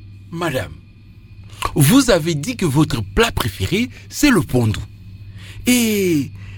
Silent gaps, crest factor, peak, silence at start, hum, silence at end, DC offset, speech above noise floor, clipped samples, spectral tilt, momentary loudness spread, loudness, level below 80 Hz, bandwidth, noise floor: none; 18 dB; -2 dBFS; 0 s; none; 0 s; under 0.1%; 25 dB; under 0.1%; -5 dB/octave; 20 LU; -17 LUFS; -36 dBFS; 19 kHz; -42 dBFS